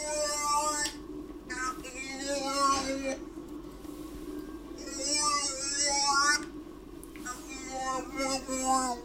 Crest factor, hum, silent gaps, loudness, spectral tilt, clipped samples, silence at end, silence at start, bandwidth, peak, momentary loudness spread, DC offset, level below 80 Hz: 20 dB; none; none; -30 LUFS; -1 dB/octave; under 0.1%; 0 s; 0 s; 16 kHz; -12 dBFS; 17 LU; under 0.1%; -54 dBFS